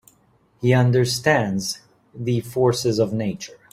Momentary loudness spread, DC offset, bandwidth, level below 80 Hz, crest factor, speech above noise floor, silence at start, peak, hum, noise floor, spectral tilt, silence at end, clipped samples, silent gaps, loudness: 11 LU; under 0.1%; 15.5 kHz; -54 dBFS; 18 dB; 39 dB; 0.6 s; -4 dBFS; none; -59 dBFS; -5.5 dB/octave; 0.2 s; under 0.1%; none; -21 LUFS